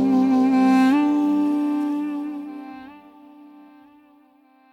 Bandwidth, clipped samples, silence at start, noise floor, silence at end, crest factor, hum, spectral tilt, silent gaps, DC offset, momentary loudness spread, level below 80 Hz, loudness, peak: 10 kHz; under 0.1%; 0 s; -56 dBFS; 1.75 s; 12 dB; none; -6.5 dB/octave; none; under 0.1%; 19 LU; -72 dBFS; -20 LUFS; -10 dBFS